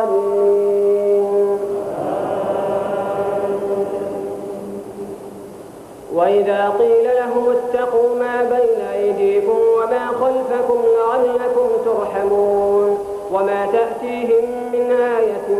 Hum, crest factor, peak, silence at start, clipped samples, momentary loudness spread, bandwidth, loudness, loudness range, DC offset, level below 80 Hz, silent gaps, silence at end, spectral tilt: none; 12 dB; -4 dBFS; 0 s; under 0.1%; 12 LU; 13 kHz; -17 LUFS; 6 LU; under 0.1%; -56 dBFS; none; 0 s; -6 dB/octave